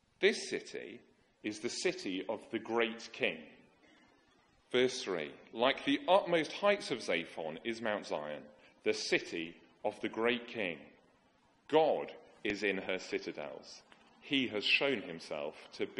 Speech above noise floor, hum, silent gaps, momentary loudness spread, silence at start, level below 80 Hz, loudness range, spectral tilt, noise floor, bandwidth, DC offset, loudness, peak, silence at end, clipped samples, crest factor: 35 dB; none; none; 16 LU; 0.2 s; -76 dBFS; 5 LU; -3.5 dB/octave; -70 dBFS; 11 kHz; under 0.1%; -35 LUFS; -14 dBFS; 0 s; under 0.1%; 22 dB